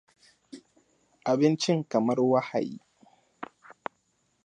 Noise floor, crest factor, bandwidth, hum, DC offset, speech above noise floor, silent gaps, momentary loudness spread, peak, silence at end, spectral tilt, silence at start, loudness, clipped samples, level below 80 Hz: -72 dBFS; 20 dB; 9.8 kHz; none; under 0.1%; 47 dB; none; 21 LU; -10 dBFS; 1 s; -6 dB/octave; 0.55 s; -26 LUFS; under 0.1%; -78 dBFS